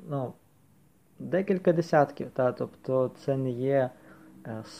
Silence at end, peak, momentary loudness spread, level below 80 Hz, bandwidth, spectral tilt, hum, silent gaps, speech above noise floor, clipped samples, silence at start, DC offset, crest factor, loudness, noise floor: 0 s; -8 dBFS; 15 LU; -70 dBFS; 13.5 kHz; -8 dB/octave; none; none; 35 dB; under 0.1%; 0 s; under 0.1%; 22 dB; -28 LUFS; -62 dBFS